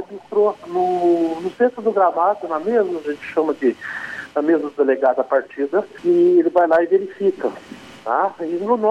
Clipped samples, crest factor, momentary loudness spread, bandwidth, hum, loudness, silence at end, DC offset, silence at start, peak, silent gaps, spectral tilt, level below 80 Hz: under 0.1%; 14 dB; 10 LU; 7.8 kHz; none; -19 LUFS; 0 s; under 0.1%; 0 s; -4 dBFS; none; -7 dB/octave; -66 dBFS